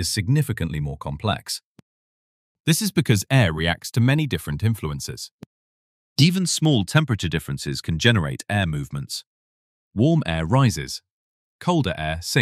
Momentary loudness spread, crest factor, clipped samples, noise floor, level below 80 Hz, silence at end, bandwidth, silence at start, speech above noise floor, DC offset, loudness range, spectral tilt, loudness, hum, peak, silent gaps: 12 LU; 22 dB; under 0.1%; under -90 dBFS; -44 dBFS; 0 s; 15.5 kHz; 0 s; over 69 dB; under 0.1%; 3 LU; -5 dB/octave; -22 LUFS; none; -2 dBFS; 1.63-1.75 s, 1.82-2.64 s, 5.32-5.39 s, 5.46-6.16 s, 9.27-9.91 s, 11.12-11.59 s